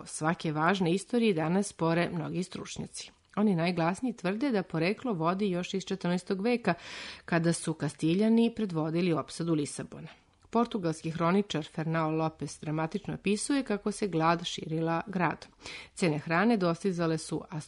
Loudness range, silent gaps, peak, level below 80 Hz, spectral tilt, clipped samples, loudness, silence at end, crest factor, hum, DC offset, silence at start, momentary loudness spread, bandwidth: 2 LU; none; -12 dBFS; -64 dBFS; -5.5 dB/octave; under 0.1%; -30 LUFS; 0 s; 18 dB; none; under 0.1%; 0 s; 11 LU; 11 kHz